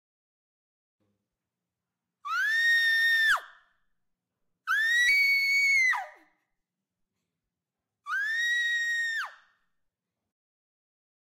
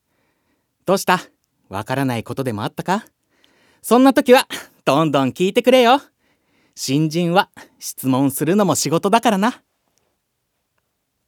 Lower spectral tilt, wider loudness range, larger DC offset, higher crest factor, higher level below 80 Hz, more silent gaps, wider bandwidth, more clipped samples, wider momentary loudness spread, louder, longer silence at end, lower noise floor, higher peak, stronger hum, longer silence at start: second, 4 dB/octave vs -5 dB/octave; about the same, 7 LU vs 7 LU; neither; about the same, 14 dB vs 18 dB; second, -76 dBFS vs -66 dBFS; neither; second, 16 kHz vs over 20 kHz; neither; second, 12 LU vs 15 LU; second, -24 LUFS vs -17 LUFS; first, 2 s vs 1.75 s; first, -88 dBFS vs -73 dBFS; second, -16 dBFS vs 0 dBFS; neither; first, 2.25 s vs 0.85 s